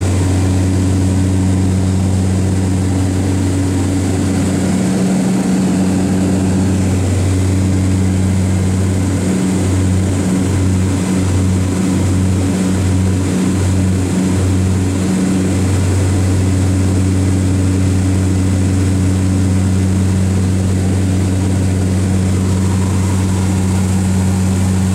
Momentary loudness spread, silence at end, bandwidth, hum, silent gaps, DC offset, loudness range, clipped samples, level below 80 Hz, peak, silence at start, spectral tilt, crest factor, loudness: 1 LU; 0 s; 13.5 kHz; none; none; under 0.1%; 1 LU; under 0.1%; -34 dBFS; -4 dBFS; 0 s; -6.5 dB/octave; 10 dB; -14 LUFS